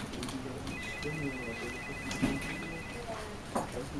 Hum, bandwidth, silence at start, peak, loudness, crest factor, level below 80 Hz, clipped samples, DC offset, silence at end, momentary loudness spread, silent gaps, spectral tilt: none; 15.5 kHz; 0 s; -16 dBFS; -38 LUFS; 22 dB; -50 dBFS; under 0.1%; under 0.1%; 0 s; 7 LU; none; -4.5 dB/octave